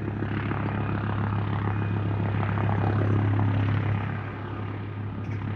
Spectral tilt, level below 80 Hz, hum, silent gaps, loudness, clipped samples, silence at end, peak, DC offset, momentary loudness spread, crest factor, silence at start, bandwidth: -10 dB/octave; -44 dBFS; none; none; -28 LUFS; under 0.1%; 0 s; -12 dBFS; under 0.1%; 9 LU; 14 dB; 0 s; 4.4 kHz